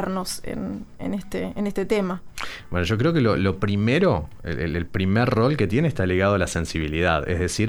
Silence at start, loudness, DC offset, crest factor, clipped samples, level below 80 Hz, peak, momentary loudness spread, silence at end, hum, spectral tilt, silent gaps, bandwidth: 0 s; -23 LUFS; under 0.1%; 18 dB; under 0.1%; -40 dBFS; -4 dBFS; 11 LU; 0 s; none; -6 dB/octave; none; 19 kHz